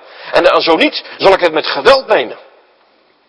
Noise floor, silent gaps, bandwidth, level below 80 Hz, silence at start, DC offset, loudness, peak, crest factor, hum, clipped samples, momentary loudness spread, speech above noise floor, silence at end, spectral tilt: -52 dBFS; none; 11 kHz; -46 dBFS; 0.2 s; under 0.1%; -11 LUFS; 0 dBFS; 12 dB; none; 1%; 5 LU; 41 dB; 0.95 s; -4 dB/octave